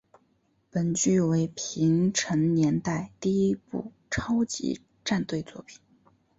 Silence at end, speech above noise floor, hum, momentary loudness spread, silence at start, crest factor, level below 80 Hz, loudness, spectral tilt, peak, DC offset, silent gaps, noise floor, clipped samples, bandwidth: 0.65 s; 43 dB; none; 11 LU; 0.75 s; 16 dB; -56 dBFS; -27 LUFS; -5.5 dB/octave; -12 dBFS; under 0.1%; none; -69 dBFS; under 0.1%; 8 kHz